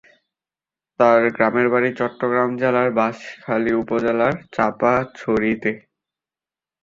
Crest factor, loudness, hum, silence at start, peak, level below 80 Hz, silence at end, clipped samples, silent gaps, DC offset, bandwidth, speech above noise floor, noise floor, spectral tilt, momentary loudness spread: 18 dB; -19 LUFS; none; 1 s; -2 dBFS; -56 dBFS; 1.05 s; under 0.1%; none; under 0.1%; 7.6 kHz; over 71 dB; under -90 dBFS; -7.5 dB/octave; 8 LU